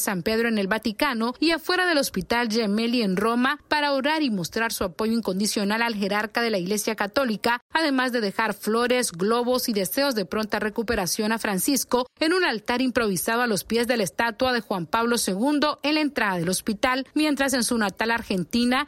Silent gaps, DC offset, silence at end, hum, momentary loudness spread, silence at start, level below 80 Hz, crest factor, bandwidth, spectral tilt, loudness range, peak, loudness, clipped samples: 7.62-7.70 s; under 0.1%; 0 s; none; 4 LU; 0 s; -54 dBFS; 18 dB; 16 kHz; -3.5 dB/octave; 1 LU; -6 dBFS; -24 LUFS; under 0.1%